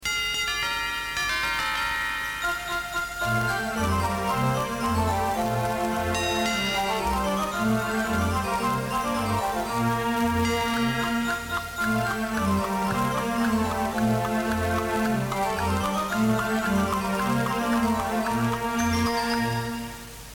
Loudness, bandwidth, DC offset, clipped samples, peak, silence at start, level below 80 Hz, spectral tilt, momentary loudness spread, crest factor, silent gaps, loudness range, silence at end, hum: -25 LUFS; 19 kHz; under 0.1%; under 0.1%; -12 dBFS; 0 s; -42 dBFS; -4.5 dB/octave; 3 LU; 14 dB; none; 1 LU; 0 s; none